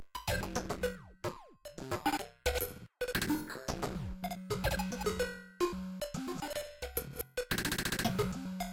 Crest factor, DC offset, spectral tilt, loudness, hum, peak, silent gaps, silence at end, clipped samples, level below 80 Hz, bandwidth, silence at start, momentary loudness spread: 20 dB; under 0.1%; -4 dB/octave; -37 LUFS; none; -16 dBFS; none; 0 s; under 0.1%; -48 dBFS; 17 kHz; 0 s; 8 LU